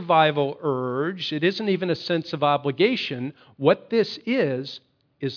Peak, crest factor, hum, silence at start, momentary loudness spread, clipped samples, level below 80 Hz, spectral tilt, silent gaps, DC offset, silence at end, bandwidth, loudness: -4 dBFS; 20 dB; none; 0 s; 10 LU; under 0.1%; -74 dBFS; -7 dB/octave; none; under 0.1%; 0 s; 5.4 kHz; -24 LUFS